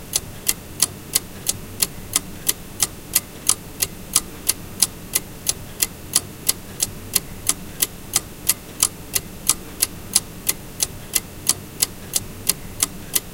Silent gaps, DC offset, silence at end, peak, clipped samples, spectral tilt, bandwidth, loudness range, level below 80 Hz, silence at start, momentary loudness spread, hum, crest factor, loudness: none; under 0.1%; 0 s; 0 dBFS; under 0.1%; -1 dB/octave; 18 kHz; 1 LU; -42 dBFS; 0 s; 5 LU; none; 24 dB; -22 LUFS